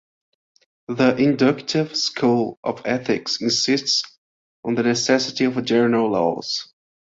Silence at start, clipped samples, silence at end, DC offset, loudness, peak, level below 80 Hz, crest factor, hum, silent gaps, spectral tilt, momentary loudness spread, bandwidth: 0.9 s; under 0.1%; 0.4 s; under 0.1%; -20 LUFS; -2 dBFS; -62 dBFS; 18 dB; none; 2.57-2.63 s, 4.18-4.63 s; -4 dB/octave; 9 LU; 7.8 kHz